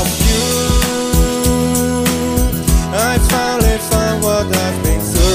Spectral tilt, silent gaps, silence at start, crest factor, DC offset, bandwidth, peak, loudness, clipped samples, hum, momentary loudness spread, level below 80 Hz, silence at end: -4.5 dB/octave; none; 0 s; 14 dB; under 0.1%; 16 kHz; 0 dBFS; -14 LUFS; under 0.1%; none; 2 LU; -18 dBFS; 0 s